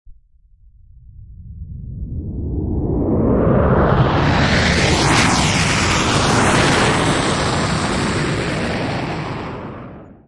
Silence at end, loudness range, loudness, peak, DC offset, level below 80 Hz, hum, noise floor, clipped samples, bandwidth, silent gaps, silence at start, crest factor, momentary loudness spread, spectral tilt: 0.2 s; 7 LU; -16 LUFS; -2 dBFS; under 0.1%; -30 dBFS; none; -50 dBFS; under 0.1%; 11.5 kHz; none; 0.1 s; 14 dB; 16 LU; -4.5 dB/octave